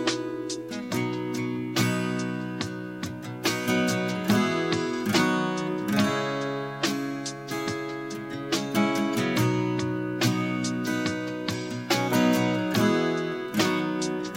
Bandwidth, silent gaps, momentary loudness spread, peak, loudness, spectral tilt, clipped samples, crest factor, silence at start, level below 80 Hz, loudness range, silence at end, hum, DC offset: 16.5 kHz; none; 9 LU; -8 dBFS; -27 LUFS; -5 dB/octave; under 0.1%; 20 dB; 0 s; -64 dBFS; 3 LU; 0 s; none; under 0.1%